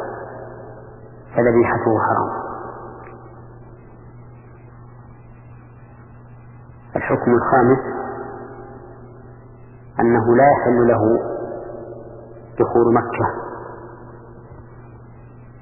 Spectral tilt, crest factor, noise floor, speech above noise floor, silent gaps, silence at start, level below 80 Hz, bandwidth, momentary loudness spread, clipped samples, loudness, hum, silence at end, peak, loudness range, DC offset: -12.5 dB/octave; 20 dB; -42 dBFS; 27 dB; none; 0 s; -48 dBFS; 2.9 kHz; 26 LU; under 0.1%; -18 LUFS; none; 0 s; -2 dBFS; 10 LU; under 0.1%